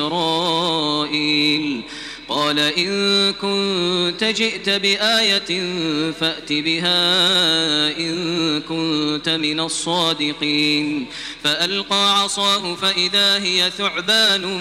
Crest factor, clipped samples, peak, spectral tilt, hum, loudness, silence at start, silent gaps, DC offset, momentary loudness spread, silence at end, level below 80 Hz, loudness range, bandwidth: 16 dB; under 0.1%; -4 dBFS; -3 dB/octave; none; -17 LUFS; 0 s; none; under 0.1%; 7 LU; 0 s; -56 dBFS; 3 LU; 16 kHz